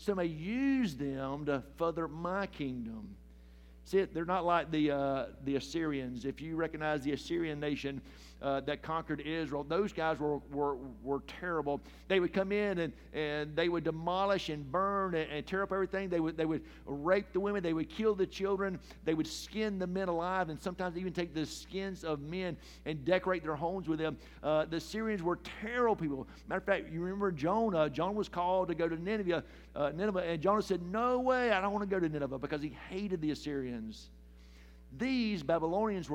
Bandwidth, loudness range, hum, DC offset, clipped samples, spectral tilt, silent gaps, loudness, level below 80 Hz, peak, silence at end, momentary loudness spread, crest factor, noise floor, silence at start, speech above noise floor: 16.5 kHz; 4 LU; none; under 0.1%; under 0.1%; -6 dB/octave; none; -35 LUFS; -56 dBFS; -14 dBFS; 0 s; 8 LU; 20 dB; -55 dBFS; 0 s; 21 dB